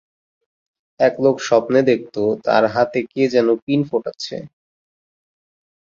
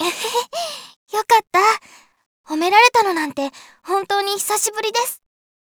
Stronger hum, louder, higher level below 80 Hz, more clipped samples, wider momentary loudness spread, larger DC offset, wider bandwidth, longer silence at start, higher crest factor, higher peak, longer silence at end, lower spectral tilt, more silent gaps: neither; about the same, -18 LUFS vs -18 LUFS; first, -62 dBFS vs -70 dBFS; neither; second, 9 LU vs 15 LU; neither; second, 7.6 kHz vs over 20 kHz; first, 1 s vs 0 s; about the same, 18 dB vs 20 dB; about the same, -2 dBFS vs 0 dBFS; first, 1.4 s vs 0.6 s; first, -6 dB/octave vs -0.5 dB/octave; second, 3.62-3.67 s vs 0.96-1.07 s, 2.26-2.44 s